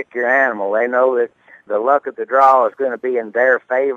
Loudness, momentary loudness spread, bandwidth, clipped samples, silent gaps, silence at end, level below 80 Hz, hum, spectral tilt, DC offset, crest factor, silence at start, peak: -16 LUFS; 9 LU; 7.2 kHz; under 0.1%; none; 0 s; -78 dBFS; none; -6 dB/octave; under 0.1%; 16 dB; 0 s; 0 dBFS